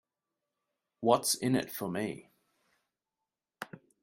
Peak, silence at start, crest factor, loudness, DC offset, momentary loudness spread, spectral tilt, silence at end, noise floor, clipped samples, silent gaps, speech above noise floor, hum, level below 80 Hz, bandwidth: -10 dBFS; 1 s; 26 dB; -31 LUFS; under 0.1%; 19 LU; -4 dB/octave; 0.25 s; -90 dBFS; under 0.1%; none; 59 dB; none; -74 dBFS; 16 kHz